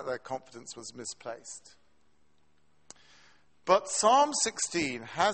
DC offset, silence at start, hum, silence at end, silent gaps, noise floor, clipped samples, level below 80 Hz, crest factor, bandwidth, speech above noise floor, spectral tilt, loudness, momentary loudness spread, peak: under 0.1%; 0 s; none; 0 s; none; -72 dBFS; under 0.1%; -70 dBFS; 22 dB; 8.8 kHz; 42 dB; -2 dB/octave; -28 LUFS; 19 LU; -10 dBFS